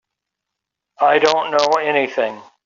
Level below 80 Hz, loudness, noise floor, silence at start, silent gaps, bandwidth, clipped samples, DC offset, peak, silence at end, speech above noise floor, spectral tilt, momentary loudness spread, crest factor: -68 dBFS; -17 LUFS; -82 dBFS; 1 s; none; 7.6 kHz; under 0.1%; under 0.1%; -2 dBFS; 0.25 s; 65 dB; -0.5 dB/octave; 8 LU; 16 dB